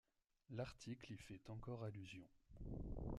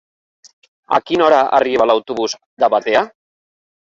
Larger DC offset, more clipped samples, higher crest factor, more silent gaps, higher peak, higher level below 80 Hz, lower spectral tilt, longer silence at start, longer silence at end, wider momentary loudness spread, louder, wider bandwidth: neither; neither; about the same, 18 dB vs 16 dB; second, none vs 2.46-2.57 s; second, -36 dBFS vs 0 dBFS; about the same, -60 dBFS vs -58 dBFS; first, -6.5 dB/octave vs -3.5 dB/octave; second, 0.5 s vs 0.9 s; second, 0 s vs 0.8 s; about the same, 8 LU vs 9 LU; second, -54 LUFS vs -15 LUFS; first, 12.5 kHz vs 7.8 kHz